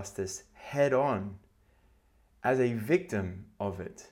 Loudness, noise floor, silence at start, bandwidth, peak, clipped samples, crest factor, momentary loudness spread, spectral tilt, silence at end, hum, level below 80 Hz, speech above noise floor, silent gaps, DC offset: -31 LUFS; -65 dBFS; 0 s; 17 kHz; -14 dBFS; under 0.1%; 18 dB; 14 LU; -6 dB/octave; 0.05 s; none; -64 dBFS; 34 dB; none; under 0.1%